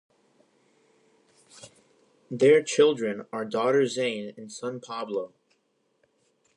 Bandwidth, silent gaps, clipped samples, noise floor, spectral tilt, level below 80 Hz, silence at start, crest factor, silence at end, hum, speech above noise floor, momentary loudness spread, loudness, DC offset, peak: 11 kHz; none; under 0.1%; -72 dBFS; -4.5 dB/octave; -82 dBFS; 1.6 s; 20 dB; 1.3 s; none; 47 dB; 16 LU; -25 LUFS; under 0.1%; -8 dBFS